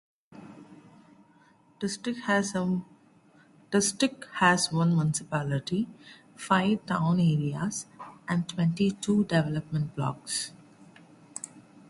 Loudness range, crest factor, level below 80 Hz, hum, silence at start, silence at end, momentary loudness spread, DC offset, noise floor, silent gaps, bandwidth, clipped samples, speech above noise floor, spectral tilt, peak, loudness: 5 LU; 22 dB; -62 dBFS; none; 0.35 s; 0.1 s; 16 LU; under 0.1%; -60 dBFS; none; 11.5 kHz; under 0.1%; 33 dB; -5 dB/octave; -8 dBFS; -28 LUFS